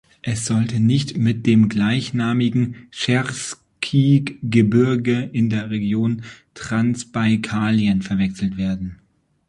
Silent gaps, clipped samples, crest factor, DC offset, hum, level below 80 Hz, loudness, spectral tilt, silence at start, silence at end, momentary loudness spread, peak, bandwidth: none; under 0.1%; 16 dB; under 0.1%; none; -48 dBFS; -20 LUFS; -6 dB/octave; 0.25 s; 0.55 s; 10 LU; -2 dBFS; 11.5 kHz